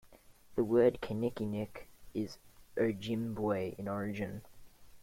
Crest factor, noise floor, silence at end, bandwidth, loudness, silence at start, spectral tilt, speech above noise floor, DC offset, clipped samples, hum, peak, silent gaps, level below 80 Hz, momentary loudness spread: 20 dB; -59 dBFS; 0 s; 16.5 kHz; -35 LUFS; 0.05 s; -7.5 dB/octave; 25 dB; under 0.1%; under 0.1%; none; -16 dBFS; none; -62 dBFS; 15 LU